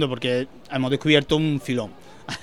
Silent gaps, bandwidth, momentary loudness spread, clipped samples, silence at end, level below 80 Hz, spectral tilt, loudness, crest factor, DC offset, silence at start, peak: none; 13 kHz; 16 LU; under 0.1%; 0 s; -52 dBFS; -5.5 dB/octave; -22 LUFS; 22 dB; 0.5%; 0 s; -2 dBFS